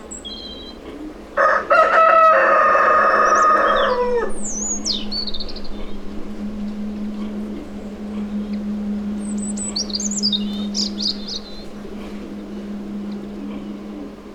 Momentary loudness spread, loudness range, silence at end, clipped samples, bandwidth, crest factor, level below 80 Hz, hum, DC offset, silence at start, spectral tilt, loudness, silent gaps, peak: 20 LU; 14 LU; 0 s; under 0.1%; 11 kHz; 18 dB; -40 dBFS; none; under 0.1%; 0 s; -3 dB/octave; -18 LUFS; none; -2 dBFS